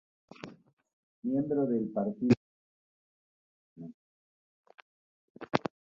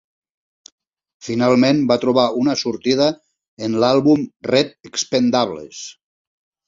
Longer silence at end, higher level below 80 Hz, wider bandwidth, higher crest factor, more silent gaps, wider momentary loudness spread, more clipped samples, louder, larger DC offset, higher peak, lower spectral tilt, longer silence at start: second, 0.4 s vs 0.75 s; second, -70 dBFS vs -58 dBFS; about the same, 7.4 kHz vs 7.6 kHz; first, 30 dB vs 18 dB; first, 0.73-0.77 s, 0.93-1.22 s, 2.37-3.76 s, 3.94-4.64 s, 4.82-5.35 s vs 3.48-3.57 s; first, 21 LU vs 16 LU; neither; second, -31 LUFS vs -17 LUFS; neither; second, -6 dBFS vs -2 dBFS; first, -8 dB/octave vs -5 dB/octave; second, 0.45 s vs 1.25 s